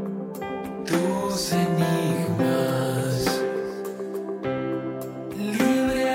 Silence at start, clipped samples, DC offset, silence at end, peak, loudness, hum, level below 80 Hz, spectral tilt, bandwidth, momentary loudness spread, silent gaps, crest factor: 0 s; under 0.1%; under 0.1%; 0 s; -10 dBFS; -25 LUFS; none; -54 dBFS; -5.5 dB/octave; 16.5 kHz; 10 LU; none; 16 dB